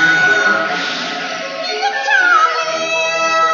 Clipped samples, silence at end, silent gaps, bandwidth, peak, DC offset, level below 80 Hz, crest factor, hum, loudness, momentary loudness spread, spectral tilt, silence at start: under 0.1%; 0 s; none; 7.4 kHz; -2 dBFS; under 0.1%; -70 dBFS; 14 dB; none; -14 LUFS; 10 LU; 1 dB/octave; 0 s